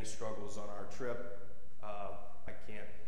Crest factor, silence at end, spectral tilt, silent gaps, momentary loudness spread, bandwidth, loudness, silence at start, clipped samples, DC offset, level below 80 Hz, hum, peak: 18 dB; 0 s; -4.5 dB/octave; none; 10 LU; 15.5 kHz; -47 LUFS; 0 s; under 0.1%; 3%; -62 dBFS; none; -24 dBFS